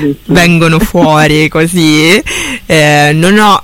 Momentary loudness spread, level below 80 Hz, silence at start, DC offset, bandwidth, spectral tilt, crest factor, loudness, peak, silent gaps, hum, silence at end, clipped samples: 4 LU; -28 dBFS; 0 s; under 0.1%; 17 kHz; -5 dB/octave; 8 dB; -7 LUFS; 0 dBFS; none; none; 0 s; 0.5%